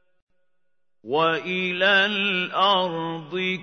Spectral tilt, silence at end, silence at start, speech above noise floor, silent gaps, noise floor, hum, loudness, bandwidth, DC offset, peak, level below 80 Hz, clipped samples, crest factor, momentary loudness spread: -5 dB/octave; 0 s; 1.05 s; 59 dB; none; -81 dBFS; none; -22 LUFS; 6.6 kHz; under 0.1%; -6 dBFS; -78 dBFS; under 0.1%; 18 dB; 9 LU